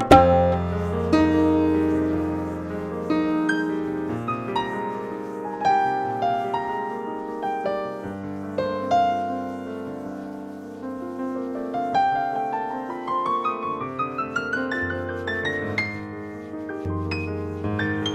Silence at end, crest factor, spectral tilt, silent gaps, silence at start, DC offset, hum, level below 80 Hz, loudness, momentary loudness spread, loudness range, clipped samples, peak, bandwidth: 0 s; 24 dB; -7 dB/octave; none; 0 s; under 0.1%; none; -46 dBFS; -25 LUFS; 12 LU; 5 LU; under 0.1%; 0 dBFS; 12 kHz